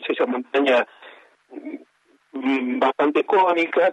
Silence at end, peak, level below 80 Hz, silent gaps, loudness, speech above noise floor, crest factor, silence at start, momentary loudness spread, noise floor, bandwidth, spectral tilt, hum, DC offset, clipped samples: 0 s; -6 dBFS; -82 dBFS; none; -20 LUFS; 41 dB; 16 dB; 0 s; 19 LU; -61 dBFS; 9 kHz; -5 dB/octave; none; under 0.1%; under 0.1%